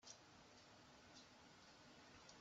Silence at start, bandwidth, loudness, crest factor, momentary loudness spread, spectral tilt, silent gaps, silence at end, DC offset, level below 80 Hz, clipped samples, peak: 0 s; 8 kHz; -64 LUFS; 20 dB; 3 LU; -2 dB/octave; none; 0 s; under 0.1%; -84 dBFS; under 0.1%; -44 dBFS